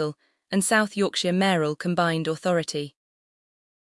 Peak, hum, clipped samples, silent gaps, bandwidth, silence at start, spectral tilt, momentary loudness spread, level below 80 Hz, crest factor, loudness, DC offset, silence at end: -8 dBFS; none; under 0.1%; none; 12 kHz; 0 s; -4.5 dB/octave; 9 LU; -70 dBFS; 18 dB; -24 LUFS; under 0.1%; 1 s